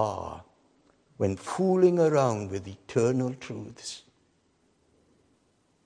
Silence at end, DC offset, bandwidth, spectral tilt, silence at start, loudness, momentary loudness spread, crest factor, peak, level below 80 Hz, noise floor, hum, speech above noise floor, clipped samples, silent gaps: 1.85 s; under 0.1%; 10.5 kHz; -6.5 dB/octave; 0 s; -27 LUFS; 18 LU; 20 dB; -10 dBFS; -64 dBFS; -68 dBFS; none; 42 dB; under 0.1%; none